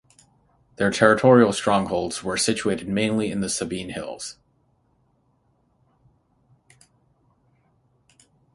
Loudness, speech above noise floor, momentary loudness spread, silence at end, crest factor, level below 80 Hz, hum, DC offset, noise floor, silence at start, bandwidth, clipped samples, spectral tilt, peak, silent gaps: -21 LUFS; 44 dB; 16 LU; 4.25 s; 24 dB; -56 dBFS; none; under 0.1%; -66 dBFS; 0.8 s; 11.5 kHz; under 0.1%; -4.5 dB/octave; 0 dBFS; none